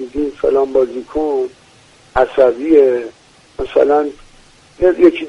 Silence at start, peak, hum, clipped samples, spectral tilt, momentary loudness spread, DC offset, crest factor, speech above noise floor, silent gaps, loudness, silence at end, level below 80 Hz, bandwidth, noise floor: 0 s; 0 dBFS; none; under 0.1%; -6.5 dB/octave; 14 LU; under 0.1%; 14 dB; 33 dB; none; -15 LUFS; 0 s; -40 dBFS; 10 kHz; -46 dBFS